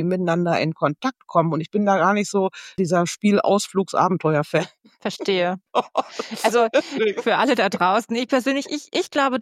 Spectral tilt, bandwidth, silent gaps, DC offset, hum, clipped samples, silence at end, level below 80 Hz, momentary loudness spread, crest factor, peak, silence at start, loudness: -5 dB/octave; 15 kHz; none; under 0.1%; none; under 0.1%; 0 s; -68 dBFS; 8 LU; 18 dB; -2 dBFS; 0 s; -21 LUFS